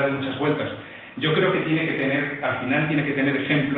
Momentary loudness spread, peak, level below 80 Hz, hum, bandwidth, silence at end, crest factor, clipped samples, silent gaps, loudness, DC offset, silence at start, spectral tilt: 6 LU; -8 dBFS; -60 dBFS; none; 4.4 kHz; 0 s; 16 dB; under 0.1%; none; -23 LUFS; under 0.1%; 0 s; -9.5 dB/octave